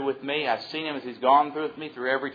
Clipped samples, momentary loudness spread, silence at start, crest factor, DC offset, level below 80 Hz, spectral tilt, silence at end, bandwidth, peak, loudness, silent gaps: under 0.1%; 11 LU; 0 s; 18 dB; under 0.1%; -78 dBFS; -6 dB/octave; 0 s; 5 kHz; -8 dBFS; -26 LUFS; none